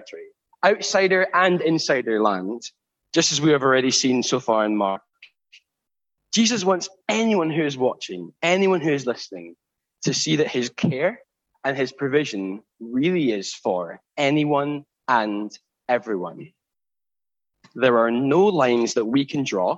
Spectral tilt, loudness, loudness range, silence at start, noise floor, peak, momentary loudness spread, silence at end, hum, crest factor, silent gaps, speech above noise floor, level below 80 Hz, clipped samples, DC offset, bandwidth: -4 dB/octave; -21 LUFS; 5 LU; 0 s; under -90 dBFS; -4 dBFS; 14 LU; 0 s; none; 20 dB; none; over 69 dB; -70 dBFS; under 0.1%; under 0.1%; 8.4 kHz